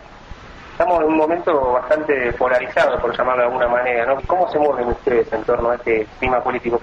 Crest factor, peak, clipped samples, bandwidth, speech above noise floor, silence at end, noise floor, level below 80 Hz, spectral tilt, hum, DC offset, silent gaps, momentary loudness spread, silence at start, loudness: 14 dB; -4 dBFS; under 0.1%; 8.2 kHz; 20 dB; 0 s; -38 dBFS; -40 dBFS; -6.5 dB/octave; none; under 0.1%; none; 3 LU; 0 s; -18 LUFS